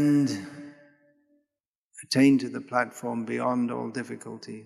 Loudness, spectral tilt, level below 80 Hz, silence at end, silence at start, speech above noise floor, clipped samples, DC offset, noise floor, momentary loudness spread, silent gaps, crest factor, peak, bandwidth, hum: -27 LUFS; -5.5 dB/octave; -76 dBFS; 0 s; 0 s; 61 dB; under 0.1%; under 0.1%; -87 dBFS; 21 LU; 1.67-1.91 s; 20 dB; -8 dBFS; 13 kHz; none